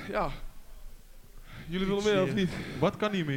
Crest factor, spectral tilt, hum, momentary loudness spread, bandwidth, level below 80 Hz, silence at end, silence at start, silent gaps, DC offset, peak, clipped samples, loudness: 18 dB; -6 dB/octave; none; 19 LU; 16.5 kHz; -46 dBFS; 0 s; 0 s; none; under 0.1%; -14 dBFS; under 0.1%; -30 LUFS